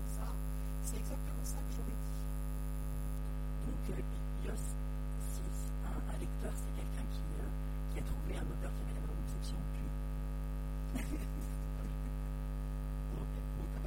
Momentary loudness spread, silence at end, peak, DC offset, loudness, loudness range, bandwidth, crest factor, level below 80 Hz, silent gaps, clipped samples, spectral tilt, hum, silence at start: 1 LU; 0 s; -26 dBFS; under 0.1%; -42 LUFS; 0 LU; 16 kHz; 12 dB; -40 dBFS; none; under 0.1%; -6.5 dB/octave; none; 0 s